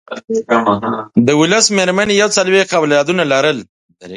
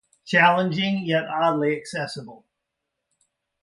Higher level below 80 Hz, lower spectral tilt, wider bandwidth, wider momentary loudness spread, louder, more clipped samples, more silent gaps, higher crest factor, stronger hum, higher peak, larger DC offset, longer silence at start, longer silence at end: first, -54 dBFS vs -70 dBFS; second, -3.5 dB/octave vs -5.5 dB/octave; about the same, 11.5 kHz vs 11.5 kHz; second, 7 LU vs 13 LU; first, -13 LUFS vs -22 LUFS; neither; first, 3.69-3.89 s vs none; second, 14 dB vs 20 dB; neither; first, 0 dBFS vs -4 dBFS; neither; second, 0.1 s vs 0.25 s; second, 0 s vs 1.3 s